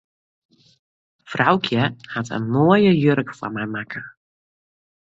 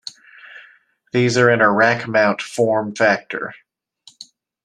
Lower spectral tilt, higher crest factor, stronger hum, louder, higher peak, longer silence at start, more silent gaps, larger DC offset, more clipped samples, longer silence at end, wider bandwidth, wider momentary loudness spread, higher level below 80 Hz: first, -7 dB/octave vs -5 dB/octave; about the same, 20 dB vs 18 dB; neither; second, -20 LUFS vs -17 LUFS; about the same, -2 dBFS vs -2 dBFS; first, 1.3 s vs 0.45 s; neither; neither; neither; first, 1.05 s vs 0.4 s; second, 7.8 kHz vs 12.5 kHz; about the same, 16 LU vs 14 LU; about the same, -58 dBFS vs -62 dBFS